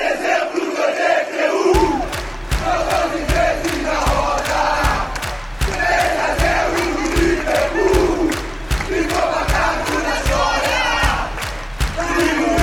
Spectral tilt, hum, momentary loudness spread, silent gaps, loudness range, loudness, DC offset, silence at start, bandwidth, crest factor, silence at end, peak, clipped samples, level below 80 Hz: -4.5 dB/octave; none; 8 LU; none; 1 LU; -18 LUFS; under 0.1%; 0 s; 17.5 kHz; 18 dB; 0 s; 0 dBFS; under 0.1%; -26 dBFS